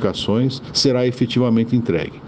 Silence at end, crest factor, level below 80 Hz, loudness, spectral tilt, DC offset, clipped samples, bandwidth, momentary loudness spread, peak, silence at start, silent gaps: 0 s; 14 dB; -48 dBFS; -18 LUFS; -6 dB/octave; under 0.1%; under 0.1%; 9.4 kHz; 3 LU; -4 dBFS; 0 s; none